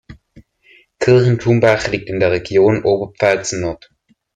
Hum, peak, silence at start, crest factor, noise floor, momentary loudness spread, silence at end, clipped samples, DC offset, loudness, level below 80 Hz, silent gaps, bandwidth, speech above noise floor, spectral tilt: none; 0 dBFS; 0.1 s; 16 dB; -51 dBFS; 9 LU; 0.6 s; under 0.1%; under 0.1%; -15 LUFS; -46 dBFS; none; 9.2 kHz; 37 dB; -6 dB/octave